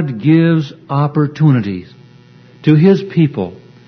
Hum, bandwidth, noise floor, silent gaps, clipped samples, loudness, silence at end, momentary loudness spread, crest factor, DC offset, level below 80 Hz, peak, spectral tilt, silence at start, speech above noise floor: none; 6.2 kHz; -42 dBFS; none; under 0.1%; -13 LUFS; 0.35 s; 13 LU; 14 dB; under 0.1%; -56 dBFS; 0 dBFS; -9.5 dB/octave; 0 s; 30 dB